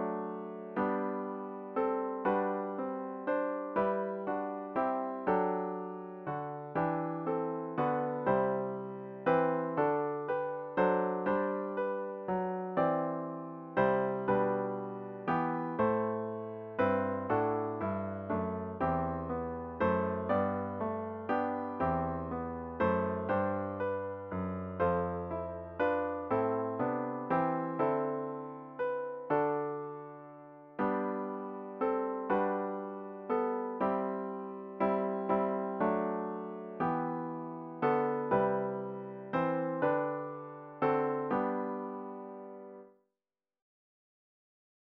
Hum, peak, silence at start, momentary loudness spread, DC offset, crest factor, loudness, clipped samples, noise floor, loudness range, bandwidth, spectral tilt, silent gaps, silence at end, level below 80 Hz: none; -16 dBFS; 0 s; 10 LU; under 0.1%; 18 dB; -34 LUFS; under 0.1%; under -90 dBFS; 3 LU; 5.2 kHz; -7 dB/octave; none; 2.1 s; -64 dBFS